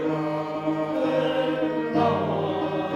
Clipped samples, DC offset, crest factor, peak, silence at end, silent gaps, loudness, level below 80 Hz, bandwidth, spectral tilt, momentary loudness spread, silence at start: under 0.1%; under 0.1%; 16 dB; -10 dBFS; 0 s; none; -25 LUFS; -62 dBFS; 8 kHz; -7.5 dB/octave; 4 LU; 0 s